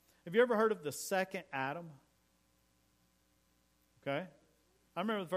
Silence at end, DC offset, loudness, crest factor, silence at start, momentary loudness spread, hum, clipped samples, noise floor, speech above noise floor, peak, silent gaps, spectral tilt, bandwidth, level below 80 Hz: 0 s; under 0.1%; -36 LUFS; 22 dB; 0.25 s; 16 LU; none; under 0.1%; -74 dBFS; 39 dB; -16 dBFS; none; -4.5 dB/octave; 15.5 kHz; -80 dBFS